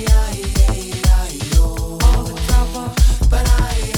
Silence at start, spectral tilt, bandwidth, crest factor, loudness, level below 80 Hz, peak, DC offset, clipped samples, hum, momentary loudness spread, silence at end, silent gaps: 0 s; -4.5 dB/octave; 17 kHz; 14 dB; -17 LUFS; -14 dBFS; 0 dBFS; under 0.1%; under 0.1%; none; 4 LU; 0 s; none